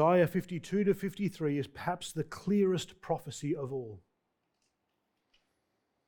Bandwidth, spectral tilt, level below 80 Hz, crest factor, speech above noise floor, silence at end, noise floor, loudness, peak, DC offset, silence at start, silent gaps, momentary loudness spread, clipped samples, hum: 19 kHz; -6.5 dB/octave; -66 dBFS; 18 dB; 49 dB; 2.1 s; -81 dBFS; -33 LUFS; -14 dBFS; under 0.1%; 0 s; none; 9 LU; under 0.1%; none